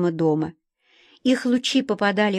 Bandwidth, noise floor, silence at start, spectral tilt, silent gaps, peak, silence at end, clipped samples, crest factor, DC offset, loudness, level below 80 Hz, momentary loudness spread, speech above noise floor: 10.5 kHz; -60 dBFS; 0 s; -5 dB/octave; none; -8 dBFS; 0 s; under 0.1%; 14 dB; under 0.1%; -22 LUFS; -66 dBFS; 6 LU; 39 dB